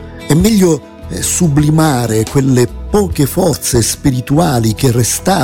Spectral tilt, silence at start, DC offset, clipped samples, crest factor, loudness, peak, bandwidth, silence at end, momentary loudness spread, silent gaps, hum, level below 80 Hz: -5.5 dB/octave; 0 s; under 0.1%; under 0.1%; 12 dB; -12 LUFS; 0 dBFS; 17.5 kHz; 0 s; 4 LU; none; none; -30 dBFS